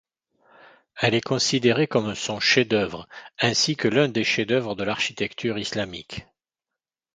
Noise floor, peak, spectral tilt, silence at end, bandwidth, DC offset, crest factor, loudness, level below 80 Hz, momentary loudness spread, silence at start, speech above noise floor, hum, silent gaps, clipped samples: -88 dBFS; -4 dBFS; -4 dB/octave; 0.95 s; 9.6 kHz; under 0.1%; 20 dB; -23 LUFS; -58 dBFS; 11 LU; 0.95 s; 65 dB; none; none; under 0.1%